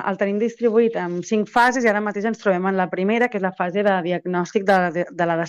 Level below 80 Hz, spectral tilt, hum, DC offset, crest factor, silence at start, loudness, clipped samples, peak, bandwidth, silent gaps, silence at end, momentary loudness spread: -64 dBFS; -6 dB/octave; none; under 0.1%; 14 dB; 0 s; -20 LUFS; under 0.1%; -6 dBFS; 12 kHz; none; 0 s; 6 LU